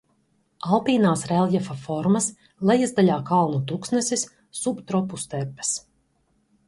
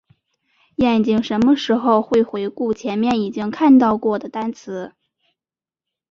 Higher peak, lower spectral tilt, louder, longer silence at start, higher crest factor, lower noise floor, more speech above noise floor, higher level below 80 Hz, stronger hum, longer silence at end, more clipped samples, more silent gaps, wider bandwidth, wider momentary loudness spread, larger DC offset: about the same, -4 dBFS vs -2 dBFS; second, -5 dB/octave vs -6.5 dB/octave; second, -23 LUFS vs -18 LUFS; second, 0.65 s vs 0.8 s; about the same, 18 dB vs 16 dB; second, -67 dBFS vs under -90 dBFS; second, 45 dB vs over 73 dB; second, -62 dBFS vs -54 dBFS; neither; second, 0.9 s vs 1.25 s; neither; neither; first, 11.5 kHz vs 7.4 kHz; second, 10 LU vs 15 LU; neither